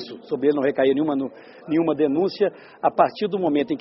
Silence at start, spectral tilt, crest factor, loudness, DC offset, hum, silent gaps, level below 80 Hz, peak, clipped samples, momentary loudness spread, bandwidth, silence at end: 0 s; -5 dB/octave; 18 dB; -22 LUFS; under 0.1%; none; none; -66 dBFS; -4 dBFS; under 0.1%; 7 LU; 5.8 kHz; 0 s